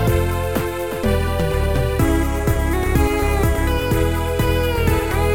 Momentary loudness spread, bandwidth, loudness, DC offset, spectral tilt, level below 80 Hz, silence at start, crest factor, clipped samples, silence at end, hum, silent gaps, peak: 3 LU; 17 kHz; -19 LUFS; 0.9%; -6 dB/octave; -22 dBFS; 0 s; 14 dB; under 0.1%; 0 s; none; none; -4 dBFS